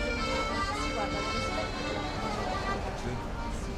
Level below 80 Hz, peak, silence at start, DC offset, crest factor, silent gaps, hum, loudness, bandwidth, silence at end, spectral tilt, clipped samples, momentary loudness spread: -40 dBFS; -20 dBFS; 0 s; under 0.1%; 12 dB; none; none; -32 LUFS; 14 kHz; 0 s; -4.5 dB/octave; under 0.1%; 6 LU